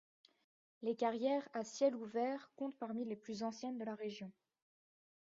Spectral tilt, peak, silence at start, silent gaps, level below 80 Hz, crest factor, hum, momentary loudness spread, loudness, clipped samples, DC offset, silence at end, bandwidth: -4.5 dB/octave; -22 dBFS; 0.8 s; none; -88 dBFS; 20 dB; none; 9 LU; -41 LUFS; under 0.1%; under 0.1%; 0.9 s; 7.4 kHz